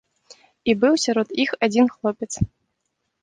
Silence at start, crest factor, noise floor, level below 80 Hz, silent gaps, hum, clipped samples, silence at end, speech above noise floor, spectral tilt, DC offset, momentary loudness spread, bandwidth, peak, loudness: 0.65 s; 18 dB; -76 dBFS; -46 dBFS; none; none; under 0.1%; 0.75 s; 56 dB; -4.5 dB/octave; under 0.1%; 9 LU; 10 kHz; -4 dBFS; -21 LUFS